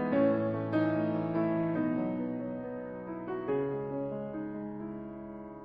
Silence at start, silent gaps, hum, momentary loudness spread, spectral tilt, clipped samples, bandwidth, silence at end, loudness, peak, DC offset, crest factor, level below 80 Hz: 0 s; none; none; 12 LU; -11 dB/octave; under 0.1%; 5.2 kHz; 0 s; -33 LUFS; -16 dBFS; under 0.1%; 16 dB; -64 dBFS